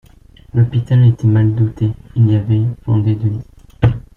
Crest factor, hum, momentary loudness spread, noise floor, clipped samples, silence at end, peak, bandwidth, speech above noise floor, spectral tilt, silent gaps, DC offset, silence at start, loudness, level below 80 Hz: 14 dB; none; 8 LU; -43 dBFS; under 0.1%; 0.15 s; -2 dBFS; 3.7 kHz; 30 dB; -10 dB/octave; none; under 0.1%; 0.55 s; -15 LUFS; -38 dBFS